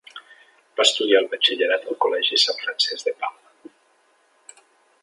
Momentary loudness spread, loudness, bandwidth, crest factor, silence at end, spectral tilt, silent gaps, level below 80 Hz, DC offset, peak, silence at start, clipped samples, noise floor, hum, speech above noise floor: 13 LU; -20 LUFS; 11.5 kHz; 24 dB; 1.7 s; 0.5 dB/octave; none; -84 dBFS; under 0.1%; 0 dBFS; 0.15 s; under 0.1%; -61 dBFS; none; 40 dB